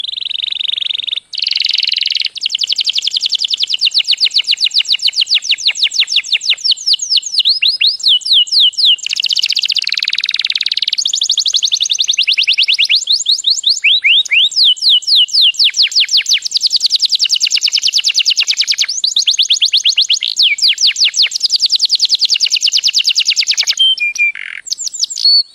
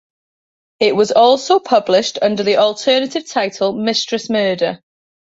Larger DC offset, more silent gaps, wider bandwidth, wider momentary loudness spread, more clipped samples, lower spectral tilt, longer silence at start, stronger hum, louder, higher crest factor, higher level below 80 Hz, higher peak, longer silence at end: neither; neither; first, 16.5 kHz vs 8 kHz; about the same, 6 LU vs 8 LU; neither; second, 6.5 dB/octave vs -3.5 dB/octave; second, 0.05 s vs 0.8 s; neither; first, -10 LUFS vs -15 LUFS; about the same, 12 dB vs 14 dB; second, -68 dBFS vs -62 dBFS; about the same, 0 dBFS vs -2 dBFS; second, 0.1 s vs 0.65 s